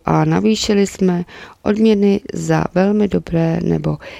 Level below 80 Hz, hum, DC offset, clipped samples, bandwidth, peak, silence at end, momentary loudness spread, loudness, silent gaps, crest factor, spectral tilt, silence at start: -42 dBFS; none; under 0.1%; under 0.1%; 12.5 kHz; 0 dBFS; 0 s; 6 LU; -16 LUFS; none; 16 dB; -6.5 dB/octave; 0.05 s